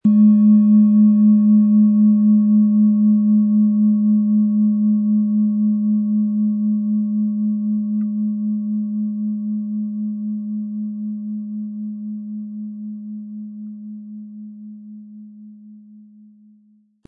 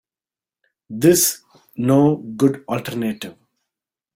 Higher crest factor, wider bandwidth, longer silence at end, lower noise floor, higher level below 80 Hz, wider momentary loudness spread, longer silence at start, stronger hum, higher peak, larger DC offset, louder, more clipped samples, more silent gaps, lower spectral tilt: second, 12 dB vs 18 dB; second, 1.2 kHz vs 17 kHz; first, 1.3 s vs 0.85 s; second, -55 dBFS vs under -90 dBFS; second, -76 dBFS vs -58 dBFS; about the same, 20 LU vs 20 LU; second, 0.05 s vs 0.9 s; neither; second, -6 dBFS vs -2 dBFS; neither; about the same, -17 LUFS vs -18 LUFS; neither; neither; first, -15 dB/octave vs -5 dB/octave